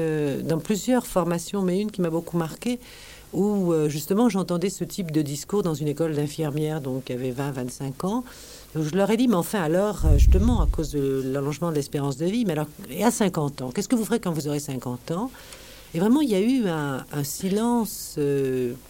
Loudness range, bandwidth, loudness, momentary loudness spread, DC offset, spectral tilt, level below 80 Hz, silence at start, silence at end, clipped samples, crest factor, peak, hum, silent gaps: 4 LU; 17 kHz; -25 LUFS; 9 LU; under 0.1%; -6 dB/octave; -32 dBFS; 0 s; 0 s; under 0.1%; 20 dB; -4 dBFS; none; none